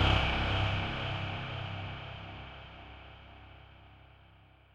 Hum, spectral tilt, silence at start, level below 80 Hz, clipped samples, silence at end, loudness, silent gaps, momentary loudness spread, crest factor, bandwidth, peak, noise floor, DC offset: none; -6 dB/octave; 0 s; -42 dBFS; under 0.1%; 0.75 s; -34 LUFS; none; 23 LU; 20 dB; 7.8 kHz; -14 dBFS; -60 dBFS; under 0.1%